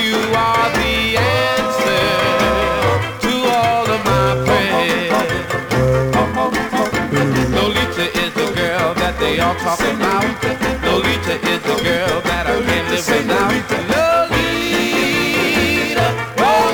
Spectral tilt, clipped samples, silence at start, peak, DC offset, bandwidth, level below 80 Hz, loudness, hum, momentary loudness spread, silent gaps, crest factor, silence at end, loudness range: -4.5 dB/octave; under 0.1%; 0 s; -4 dBFS; under 0.1%; over 20 kHz; -34 dBFS; -16 LUFS; none; 3 LU; none; 12 dB; 0 s; 2 LU